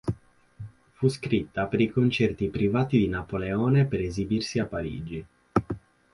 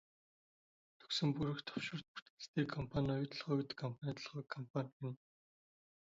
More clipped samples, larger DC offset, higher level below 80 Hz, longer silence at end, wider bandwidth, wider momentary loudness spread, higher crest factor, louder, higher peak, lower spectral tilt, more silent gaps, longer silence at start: neither; neither; first, -48 dBFS vs -68 dBFS; second, 0.35 s vs 0.9 s; first, 11.5 kHz vs 7.6 kHz; first, 16 LU vs 10 LU; about the same, 22 dB vs 20 dB; first, -26 LUFS vs -42 LUFS; first, -6 dBFS vs -24 dBFS; first, -7 dB/octave vs -5 dB/octave; second, none vs 2.08-2.15 s, 2.22-2.37 s, 2.48-2.54 s, 4.70-4.74 s, 4.93-5.00 s; second, 0.05 s vs 1 s